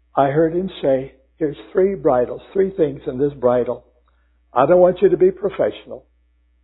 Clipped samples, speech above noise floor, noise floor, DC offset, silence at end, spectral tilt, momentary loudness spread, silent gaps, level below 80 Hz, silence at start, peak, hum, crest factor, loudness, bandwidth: under 0.1%; 42 dB; -59 dBFS; under 0.1%; 0.65 s; -12 dB/octave; 12 LU; none; -50 dBFS; 0.15 s; -2 dBFS; none; 18 dB; -18 LUFS; 4.1 kHz